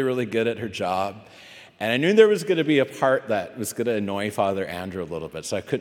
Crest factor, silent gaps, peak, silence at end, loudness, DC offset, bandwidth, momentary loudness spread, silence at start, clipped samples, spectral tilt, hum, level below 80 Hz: 22 dB; none; -2 dBFS; 0 s; -23 LUFS; under 0.1%; 17 kHz; 14 LU; 0 s; under 0.1%; -5 dB/octave; none; -66 dBFS